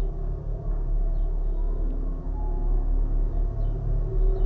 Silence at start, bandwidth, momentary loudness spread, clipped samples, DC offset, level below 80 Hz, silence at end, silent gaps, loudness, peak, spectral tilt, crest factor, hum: 0 s; 1.7 kHz; 5 LU; under 0.1%; under 0.1%; -24 dBFS; 0 s; none; -30 LUFS; -12 dBFS; -11 dB/octave; 12 dB; none